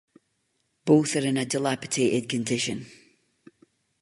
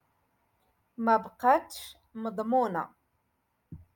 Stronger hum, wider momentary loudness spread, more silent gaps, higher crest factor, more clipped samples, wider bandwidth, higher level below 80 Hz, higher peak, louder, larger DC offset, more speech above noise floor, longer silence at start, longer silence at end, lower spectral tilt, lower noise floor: neither; second, 9 LU vs 17 LU; neither; about the same, 20 dB vs 20 dB; neither; second, 11.5 kHz vs 17.5 kHz; about the same, -66 dBFS vs -68 dBFS; first, -6 dBFS vs -12 dBFS; first, -25 LUFS vs -28 LUFS; neither; about the same, 49 dB vs 48 dB; second, 0.85 s vs 1 s; first, 1.15 s vs 0.2 s; about the same, -4.5 dB/octave vs -5.5 dB/octave; about the same, -74 dBFS vs -76 dBFS